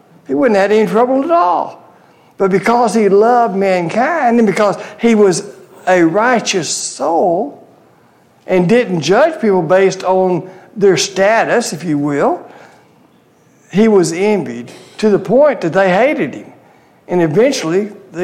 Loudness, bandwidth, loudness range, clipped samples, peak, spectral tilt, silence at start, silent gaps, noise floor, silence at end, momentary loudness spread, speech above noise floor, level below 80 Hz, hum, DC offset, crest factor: -13 LUFS; 14 kHz; 3 LU; under 0.1%; -2 dBFS; -5 dB/octave; 0.3 s; none; -49 dBFS; 0 s; 9 LU; 37 dB; -58 dBFS; none; under 0.1%; 12 dB